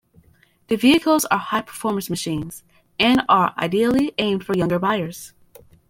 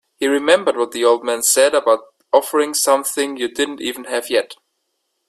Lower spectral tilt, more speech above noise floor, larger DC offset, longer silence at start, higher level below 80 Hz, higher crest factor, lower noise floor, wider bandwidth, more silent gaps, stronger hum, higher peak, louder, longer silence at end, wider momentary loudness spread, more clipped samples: first, -4.5 dB/octave vs -1 dB/octave; second, 37 dB vs 55 dB; neither; first, 0.7 s vs 0.2 s; first, -52 dBFS vs -66 dBFS; about the same, 18 dB vs 18 dB; second, -56 dBFS vs -72 dBFS; about the same, 16.5 kHz vs 15.5 kHz; neither; neither; second, -4 dBFS vs 0 dBFS; second, -20 LUFS vs -17 LUFS; second, 0.6 s vs 0.75 s; first, 16 LU vs 8 LU; neither